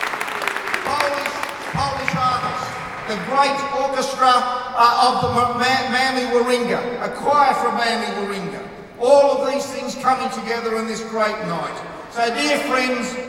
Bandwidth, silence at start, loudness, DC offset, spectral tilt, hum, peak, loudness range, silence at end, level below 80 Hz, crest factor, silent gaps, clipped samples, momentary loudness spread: 18 kHz; 0 s; -19 LUFS; under 0.1%; -3.5 dB/octave; none; -2 dBFS; 4 LU; 0 s; -52 dBFS; 18 dB; none; under 0.1%; 11 LU